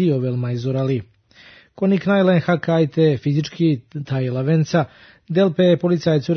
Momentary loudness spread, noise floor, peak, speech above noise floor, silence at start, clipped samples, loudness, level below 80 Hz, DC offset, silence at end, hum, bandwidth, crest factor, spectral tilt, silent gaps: 7 LU; -48 dBFS; -4 dBFS; 30 dB; 0 s; under 0.1%; -19 LUFS; -58 dBFS; under 0.1%; 0 s; none; 6.6 kHz; 14 dB; -8 dB/octave; none